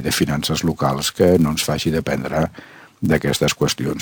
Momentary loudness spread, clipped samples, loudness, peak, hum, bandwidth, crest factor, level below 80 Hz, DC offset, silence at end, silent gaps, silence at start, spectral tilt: 7 LU; under 0.1%; -19 LUFS; -2 dBFS; none; over 20 kHz; 16 dB; -40 dBFS; under 0.1%; 0 s; none; 0 s; -4.5 dB/octave